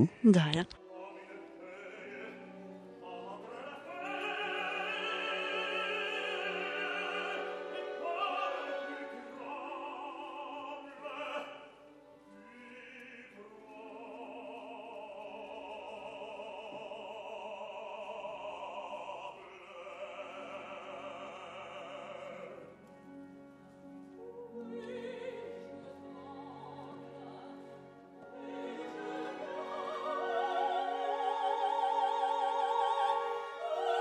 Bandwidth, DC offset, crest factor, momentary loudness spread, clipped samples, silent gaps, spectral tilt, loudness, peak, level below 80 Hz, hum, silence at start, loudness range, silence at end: 10.5 kHz; under 0.1%; 26 dB; 19 LU; under 0.1%; none; -6 dB/octave; -38 LUFS; -12 dBFS; -78 dBFS; none; 0 s; 14 LU; 0 s